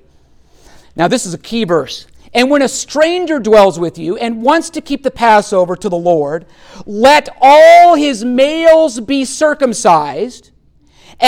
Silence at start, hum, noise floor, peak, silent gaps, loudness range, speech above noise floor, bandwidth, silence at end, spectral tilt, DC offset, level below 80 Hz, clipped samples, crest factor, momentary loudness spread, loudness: 0.95 s; none; -48 dBFS; 0 dBFS; none; 6 LU; 38 dB; 16 kHz; 0 s; -4 dB/octave; under 0.1%; -46 dBFS; under 0.1%; 12 dB; 13 LU; -11 LUFS